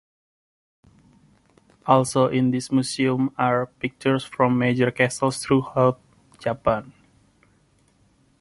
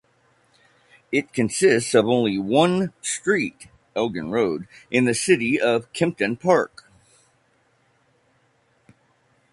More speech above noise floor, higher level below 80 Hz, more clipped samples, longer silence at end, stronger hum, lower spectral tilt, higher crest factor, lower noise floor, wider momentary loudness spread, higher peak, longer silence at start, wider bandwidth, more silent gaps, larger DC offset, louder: about the same, 40 dB vs 43 dB; about the same, -56 dBFS vs -60 dBFS; neither; second, 1.5 s vs 2.85 s; neither; first, -6 dB/octave vs -4.5 dB/octave; about the same, 22 dB vs 20 dB; about the same, -61 dBFS vs -64 dBFS; about the same, 9 LU vs 7 LU; about the same, -2 dBFS vs -4 dBFS; first, 1.85 s vs 1.1 s; about the same, 11.5 kHz vs 11.5 kHz; neither; neither; about the same, -22 LUFS vs -21 LUFS